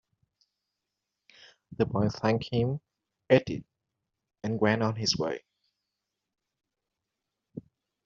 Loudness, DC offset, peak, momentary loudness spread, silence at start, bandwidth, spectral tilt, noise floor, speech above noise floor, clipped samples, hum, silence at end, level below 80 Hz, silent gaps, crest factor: -29 LUFS; under 0.1%; -8 dBFS; 22 LU; 1.7 s; 7.4 kHz; -5 dB/octave; -86 dBFS; 59 dB; under 0.1%; none; 0.45 s; -62 dBFS; none; 24 dB